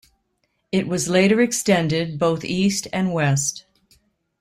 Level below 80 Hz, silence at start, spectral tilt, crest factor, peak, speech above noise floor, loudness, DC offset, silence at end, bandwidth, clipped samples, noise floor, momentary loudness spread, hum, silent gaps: -56 dBFS; 0.75 s; -4.5 dB/octave; 16 dB; -4 dBFS; 51 dB; -20 LUFS; under 0.1%; 0.8 s; 15.5 kHz; under 0.1%; -71 dBFS; 7 LU; none; none